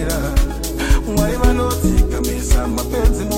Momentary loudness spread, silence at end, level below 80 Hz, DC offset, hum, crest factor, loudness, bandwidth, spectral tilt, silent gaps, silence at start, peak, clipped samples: 4 LU; 0 s; -18 dBFS; under 0.1%; none; 14 dB; -18 LUFS; 16.5 kHz; -5.5 dB/octave; none; 0 s; -2 dBFS; under 0.1%